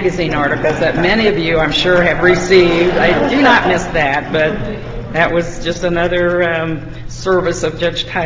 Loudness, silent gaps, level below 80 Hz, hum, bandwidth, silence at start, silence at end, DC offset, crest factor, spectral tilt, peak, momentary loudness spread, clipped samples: -13 LUFS; none; -32 dBFS; none; 7.8 kHz; 0 s; 0 s; under 0.1%; 14 dB; -5 dB/octave; 0 dBFS; 11 LU; under 0.1%